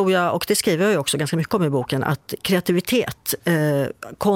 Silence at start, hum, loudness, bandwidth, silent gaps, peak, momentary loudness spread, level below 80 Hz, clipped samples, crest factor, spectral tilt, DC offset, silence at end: 0 s; none; -21 LUFS; 17 kHz; none; -6 dBFS; 5 LU; -54 dBFS; under 0.1%; 14 dB; -5 dB/octave; under 0.1%; 0 s